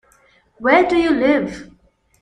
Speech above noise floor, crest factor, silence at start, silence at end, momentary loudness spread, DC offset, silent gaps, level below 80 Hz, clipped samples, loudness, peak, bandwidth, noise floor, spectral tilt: 40 dB; 18 dB; 0.6 s; 0.6 s; 14 LU; under 0.1%; none; -48 dBFS; under 0.1%; -16 LUFS; 0 dBFS; 10 kHz; -55 dBFS; -5.5 dB/octave